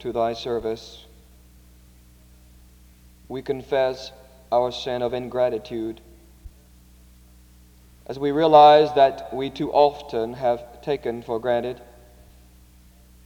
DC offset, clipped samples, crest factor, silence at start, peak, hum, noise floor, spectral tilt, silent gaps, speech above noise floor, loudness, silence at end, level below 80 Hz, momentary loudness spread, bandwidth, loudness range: under 0.1%; under 0.1%; 22 dB; 0 s; -2 dBFS; 60 Hz at -55 dBFS; -51 dBFS; -6 dB/octave; none; 30 dB; -21 LUFS; 1.4 s; -52 dBFS; 19 LU; 18 kHz; 13 LU